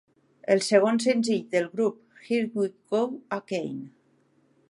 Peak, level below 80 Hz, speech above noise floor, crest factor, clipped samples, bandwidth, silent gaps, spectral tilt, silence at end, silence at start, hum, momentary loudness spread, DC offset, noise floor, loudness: -6 dBFS; -76 dBFS; 40 dB; 22 dB; under 0.1%; 11.5 kHz; none; -4.5 dB/octave; 0.85 s; 0.5 s; none; 14 LU; under 0.1%; -65 dBFS; -26 LUFS